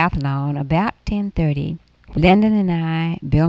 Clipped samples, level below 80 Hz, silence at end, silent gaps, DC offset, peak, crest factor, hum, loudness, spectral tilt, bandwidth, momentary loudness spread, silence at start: under 0.1%; -34 dBFS; 0 s; none; under 0.1%; -2 dBFS; 16 dB; none; -19 LUFS; -9 dB/octave; 7.4 kHz; 10 LU; 0 s